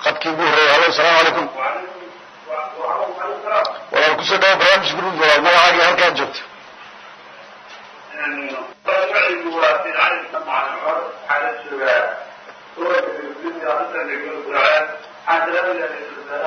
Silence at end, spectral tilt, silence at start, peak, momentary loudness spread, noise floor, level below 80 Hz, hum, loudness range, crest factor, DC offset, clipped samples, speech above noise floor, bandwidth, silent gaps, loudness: 0 s; -2.5 dB/octave; 0 s; 0 dBFS; 16 LU; -40 dBFS; -64 dBFS; none; 8 LU; 18 dB; under 0.1%; under 0.1%; 24 dB; 12 kHz; none; -16 LUFS